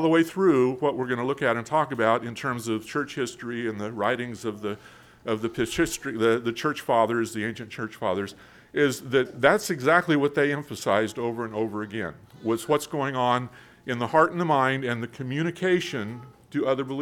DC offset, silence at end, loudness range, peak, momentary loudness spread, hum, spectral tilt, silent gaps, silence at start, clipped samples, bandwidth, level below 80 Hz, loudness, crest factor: under 0.1%; 0 s; 4 LU; -4 dBFS; 12 LU; none; -5.5 dB/octave; none; 0 s; under 0.1%; 17.5 kHz; -60 dBFS; -26 LUFS; 22 dB